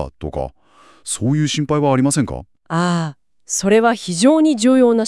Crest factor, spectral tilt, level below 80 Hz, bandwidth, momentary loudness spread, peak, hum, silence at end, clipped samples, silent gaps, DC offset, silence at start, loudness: 14 dB; -5 dB/octave; -44 dBFS; 12 kHz; 14 LU; -2 dBFS; none; 0 s; under 0.1%; none; 0.2%; 0 s; -17 LUFS